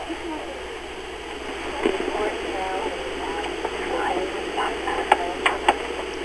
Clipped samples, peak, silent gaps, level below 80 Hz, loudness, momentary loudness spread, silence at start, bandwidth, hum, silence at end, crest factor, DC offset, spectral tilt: under 0.1%; 0 dBFS; none; -46 dBFS; -26 LUFS; 11 LU; 0 s; 11 kHz; none; 0 s; 26 dB; 0.1%; -3.5 dB/octave